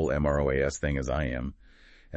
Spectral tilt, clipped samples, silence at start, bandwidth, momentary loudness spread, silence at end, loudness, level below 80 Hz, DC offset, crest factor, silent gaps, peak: -6.5 dB/octave; under 0.1%; 0 s; 8.4 kHz; 9 LU; 0 s; -29 LUFS; -38 dBFS; under 0.1%; 16 dB; none; -14 dBFS